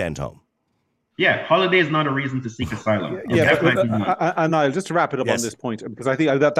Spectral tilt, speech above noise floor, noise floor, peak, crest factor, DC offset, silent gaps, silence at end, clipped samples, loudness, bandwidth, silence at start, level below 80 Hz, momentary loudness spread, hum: -5.5 dB/octave; 51 dB; -71 dBFS; -4 dBFS; 16 dB; under 0.1%; none; 0 s; under 0.1%; -20 LUFS; 15.5 kHz; 0 s; -52 dBFS; 10 LU; none